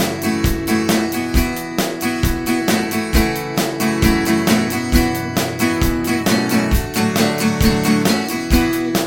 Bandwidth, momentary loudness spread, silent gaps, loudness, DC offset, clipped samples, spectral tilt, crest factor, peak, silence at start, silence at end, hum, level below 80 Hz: 17.5 kHz; 4 LU; none; -17 LUFS; under 0.1%; under 0.1%; -4.5 dB/octave; 16 dB; 0 dBFS; 0 s; 0 s; none; -26 dBFS